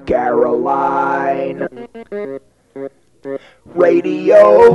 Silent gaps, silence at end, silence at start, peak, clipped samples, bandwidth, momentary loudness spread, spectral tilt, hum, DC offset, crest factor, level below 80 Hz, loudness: none; 0 s; 0.05 s; 0 dBFS; under 0.1%; 9.2 kHz; 22 LU; -7.5 dB/octave; none; 0.1%; 14 dB; -48 dBFS; -13 LUFS